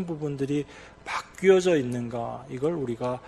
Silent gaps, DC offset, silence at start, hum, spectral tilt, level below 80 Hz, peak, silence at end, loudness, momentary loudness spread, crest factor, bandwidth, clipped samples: none; under 0.1%; 0 s; none; -6 dB/octave; -58 dBFS; -8 dBFS; 0 s; -27 LUFS; 13 LU; 20 dB; 12 kHz; under 0.1%